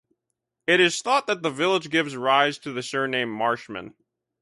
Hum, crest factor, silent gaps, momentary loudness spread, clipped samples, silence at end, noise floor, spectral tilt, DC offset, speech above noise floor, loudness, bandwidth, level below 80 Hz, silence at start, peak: none; 20 dB; none; 12 LU; under 0.1%; 0.55 s; -82 dBFS; -3.5 dB/octave; under 0.1%; 58 dB; -23 LUFS; 11.5 kHz; -70 dBFS; 0.7 s; -4 dBFS